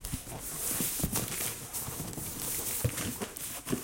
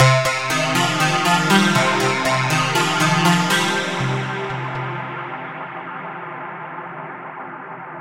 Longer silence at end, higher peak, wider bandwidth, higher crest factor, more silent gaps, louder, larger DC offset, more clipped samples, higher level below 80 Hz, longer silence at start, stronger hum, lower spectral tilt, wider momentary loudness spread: about the same, 0 s vs 0 s; second, -14 dBFS vs -2 dBFS; about the same, 17 kHz vs 17 kHz; about the same, 20 dB vs 18 dB; neither; second, -33 LUFS vs -18 LUFS; neither; neither; about the same, -50 dBFS vs -54 dBFS; about the same, 0 s vs 0 s; neither; about the same, -3 dB/octave vs -4 dB/octave; second, 7 LU vs 17 LU